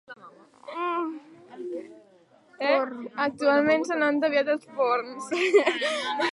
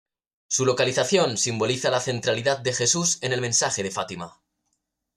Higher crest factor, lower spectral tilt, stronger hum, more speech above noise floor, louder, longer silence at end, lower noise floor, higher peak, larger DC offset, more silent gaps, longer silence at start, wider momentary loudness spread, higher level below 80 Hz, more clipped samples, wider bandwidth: about the same, 18 dB vs 16 dB; about the same, -3.5 dB/octave vs -2.5 dB/octave; neither; second, 34 dB vs 53 dB; about the same, -25 LUFS vs -23 LUFS; second, 0 s vs 0.85 s; second, -58 dBFS vs -77 dBFS; about the same, -8 dBFS vs -8 dBFS; neither; neither; second, 0.1 s vs 0.5 s; first, 15 LU vs 8 LU; second, -76 dBFS vs -64 dBFS; neither; second, 11.5 kHz vs 14.5 kHz